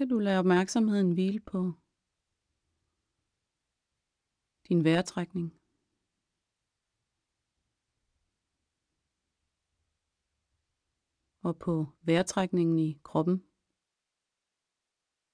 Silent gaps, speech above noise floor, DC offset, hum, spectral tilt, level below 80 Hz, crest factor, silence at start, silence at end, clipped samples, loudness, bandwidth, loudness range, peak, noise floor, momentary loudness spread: none; 59 dB; under 0.1%; none; -6.5 dB/octave; -68 dBFS; 20 dB; 0 s; 1.95 s; under 0.1%; -29 LUFS; 10.5 kHz; 12 LU; -14 dBFS; -87 dBFS; 10 LU